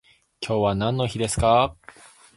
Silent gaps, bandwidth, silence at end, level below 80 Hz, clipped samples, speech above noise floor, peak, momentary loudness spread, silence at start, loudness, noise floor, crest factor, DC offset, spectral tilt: none; 11.5 kHz; 0.65 s; -42 dBFS; under 0.1%; 27 dB; -4 dBFS; 8 LU; 0.4 s; -22 LUFS; -49 dBFS; 20 dB; under 0.1%; -5 dB/octave